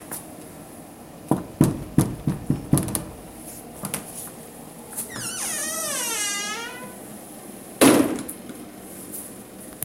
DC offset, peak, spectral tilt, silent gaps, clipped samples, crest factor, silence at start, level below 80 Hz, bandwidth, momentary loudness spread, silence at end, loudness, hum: under 0.1%; -2 dBFS; -4 dB/octave; none; under 0.1%; 24 dB; 0 s; -48 dBFS; 16.5 kHz; 19 LU; 0 s; -24 LUFS; none